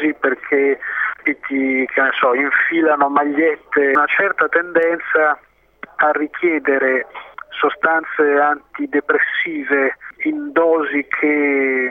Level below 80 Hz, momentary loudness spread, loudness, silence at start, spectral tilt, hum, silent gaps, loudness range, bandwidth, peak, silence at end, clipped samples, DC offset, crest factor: -64 dBFS; 7 LU; -17 LUFS; 0 s; -6.5 dB/octave; none; none; 3 LU; 3.9 kHz; -2 dBFS; 0 s; under 0.1%; under 0.1%; 16 dB